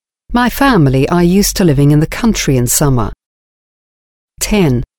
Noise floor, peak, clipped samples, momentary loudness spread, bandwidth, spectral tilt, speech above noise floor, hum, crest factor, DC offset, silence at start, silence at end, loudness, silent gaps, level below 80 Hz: under -90 dBFS; 0 dBFS; under 0.1%; 6 LU; 20 kHz; -5 dB/octave; over 80 dB; none; 12 dB; under 0.1%; 0.3 s; 0.15 s; -11 LUFS; 3.26-4.28 s; -26 dBFS